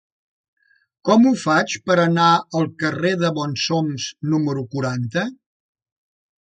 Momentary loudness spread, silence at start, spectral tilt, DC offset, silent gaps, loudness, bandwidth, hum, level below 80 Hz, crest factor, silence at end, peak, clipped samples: 10 LU; 1.05 s; -5.5 dB/octave; under 0.1%; none; -19 LUFS; 9.2 kHz; none; -62 dBFS; 18 dB; 1.2 s; -2 dBFS; under 0.1%